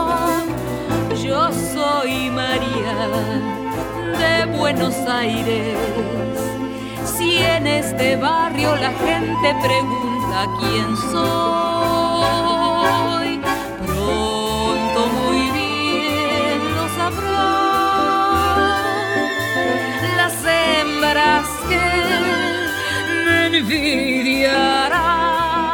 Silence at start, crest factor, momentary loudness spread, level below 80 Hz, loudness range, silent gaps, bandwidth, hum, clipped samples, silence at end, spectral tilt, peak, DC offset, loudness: 0 s; 14 dB; 6 LU; -40 dBFS; 3 LU; none; 19 kHz; none; under 0.1%; 0 s; -4 dB/octave; -4 dBFS; under 0.1%; -18 LUFS